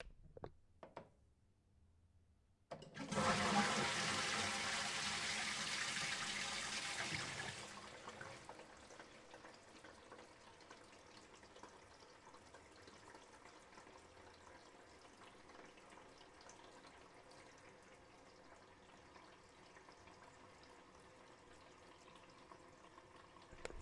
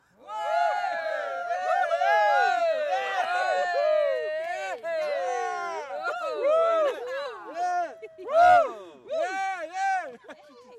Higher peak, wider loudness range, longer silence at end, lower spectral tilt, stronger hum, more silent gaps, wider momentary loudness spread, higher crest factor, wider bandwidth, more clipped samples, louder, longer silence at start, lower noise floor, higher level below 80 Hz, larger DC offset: second, -24 dBFS vs -10 dBFS; first, 23 LU vs 3 LU; about the same, 0 s vs 0 s; about the same, -2 dB/octave vs -2 dB/octave; neither; neither; first, 24 LU vs 12 LU; first, 26 dB vs 16 dB; about the same, 11.5 kHz vs 12 kHz; neither; second, -41 LUFS vs -26 LUFS; second, 0 s vs 0.25 s; first, -75 dBFS vs -48 dBFS; about the same, -72 dBFS vs -70 dBFS; neither